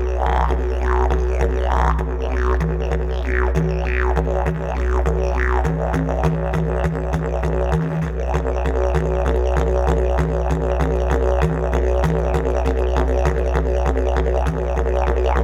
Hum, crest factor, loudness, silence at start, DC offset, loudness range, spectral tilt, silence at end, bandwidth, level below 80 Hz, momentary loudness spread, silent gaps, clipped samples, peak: none; 14 dB; -20 LUFS; 0 s; under 0.1%; 1 LU; -7.5 dB/octave; 0 s; 8 kHz; -20 dBFS; 3 LU; none; under 0.1%; -4 dBFS